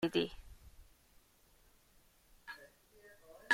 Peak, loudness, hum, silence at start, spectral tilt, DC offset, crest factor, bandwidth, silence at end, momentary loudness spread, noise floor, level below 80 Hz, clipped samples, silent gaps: -18 dBFS; -42 LUFS; none; 0 s; -4.5 dB/octave; under 0.1%; 26 dB; 16.5 kHz; 0 s; 27 LU; -68 dBFS; -64 dBFS; under 0.1%; none